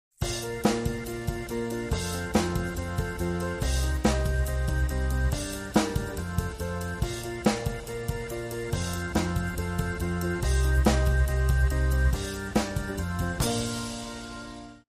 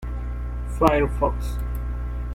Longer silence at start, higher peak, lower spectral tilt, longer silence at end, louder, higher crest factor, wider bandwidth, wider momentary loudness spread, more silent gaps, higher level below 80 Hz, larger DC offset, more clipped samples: first, 0.2 s vs 0 s; second, -10 dBFS vs -2 dBFS; second, -5.5 dB/octave vs -7.5 dB/octave; about the same, 0.1 s vs 0 s; second, -29 LUFS vs -25 LUFS; about the same, 18 dB vs 22 dB; about the same, 15.5 kHz vs 15.5 kHz; second, 8 LU vs 12 LU; neither; about the same, -30 dBFS vs -28 dBFS; neither; neither